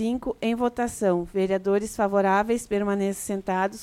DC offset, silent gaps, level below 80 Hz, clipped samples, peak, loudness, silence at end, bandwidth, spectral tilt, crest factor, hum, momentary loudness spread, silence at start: under 0.1%; none; -52 dBFS; under 0.1%; -10 dBFS; -25 LUFS; 0 s; 16 kHz; -5.5 dB/octave; 14 dB; none; 6 LU; 0 s